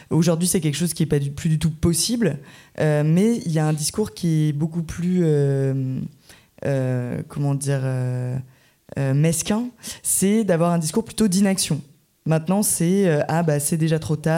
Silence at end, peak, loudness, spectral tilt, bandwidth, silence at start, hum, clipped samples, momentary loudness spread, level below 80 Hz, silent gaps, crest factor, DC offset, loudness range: 0 s; -6 dBFS; -21 LUFS; -5.5 dB/octave; 16.5 kHz; 0 s; none; under 0.1%; 9 LU; -48 dBFS; none; 14 dB; under 0.1%; 4 LU